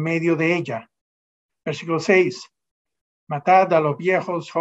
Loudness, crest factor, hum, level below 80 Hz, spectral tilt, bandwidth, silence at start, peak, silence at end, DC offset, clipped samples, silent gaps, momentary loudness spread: -20 LUFS; 18 dB; none; -72 dBFS; -6.5 dB/octave; 8 kHz; 0 s; -4 dBFS; 0 s; under 0.1%; under 0.1%; 1.01-1.49 s, 2.71-2.85 s, 3.01-3.27 s; 15 LU